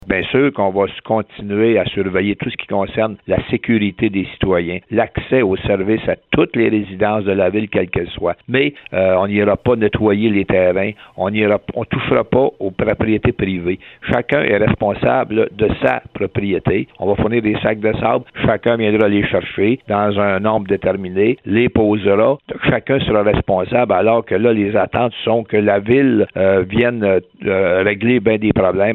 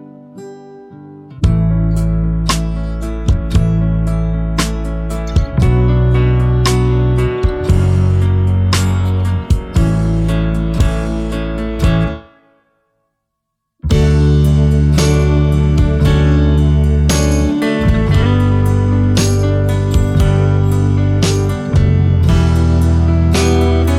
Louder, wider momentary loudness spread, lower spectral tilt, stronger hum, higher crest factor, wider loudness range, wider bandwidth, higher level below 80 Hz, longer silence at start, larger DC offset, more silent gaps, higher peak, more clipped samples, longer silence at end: about the same, -16 LUFS vs -14 LUFS; about the same, 5 LU vs 6 LU; first, -10 dB/octave vs -6.5 dB/octave; neither; about the same, 16 dB vs 12 dB; about the same, 3 LU vs 5 LU; second, 4.2 kHz vs 14.5 kHz; second, -40 dBFS vs -18 dBFS; about the same, 0.05 s vs 0 s; neither; neither; about the same, 0 dBFS vs -2 dBFS; neither; about the same, 0 s vs 0 s